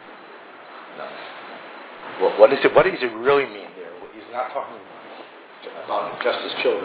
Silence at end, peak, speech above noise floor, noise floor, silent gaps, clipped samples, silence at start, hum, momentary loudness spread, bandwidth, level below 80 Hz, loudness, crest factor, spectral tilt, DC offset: 0 s; 0 dBFS; 21 dB; -42 dBFS; none; under 0.1%; 0 s; none; 25 LU; 4 kHz; -62 dBFS; -20 LUFS; 24 dB; -8 dB/octave; under 0.1%